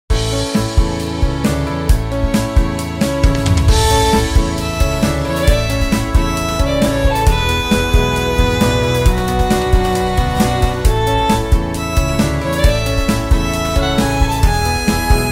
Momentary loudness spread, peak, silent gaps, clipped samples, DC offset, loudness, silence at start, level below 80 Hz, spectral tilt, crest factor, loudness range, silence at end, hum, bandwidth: 3 LU; 0 dBFS; none; under 0.1%; under 0.1%; -15 LUFS; 0.1 s; -18 dBFS; -5 dB/octave; 14 dB; 1 LU; 0 s; none; 16.5 kHz